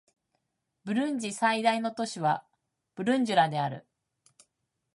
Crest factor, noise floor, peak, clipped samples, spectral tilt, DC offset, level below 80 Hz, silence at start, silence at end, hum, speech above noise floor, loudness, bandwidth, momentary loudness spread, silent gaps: 20 dB; -81 dBFS; -10 dBFS; under 0.1%; -5 dB/octave; under 0.1%; -80 dBFS; 0.85 s; 1.15 s; none; 53 dB; -28 LUFS; 11.5 kHz; 10 LU; none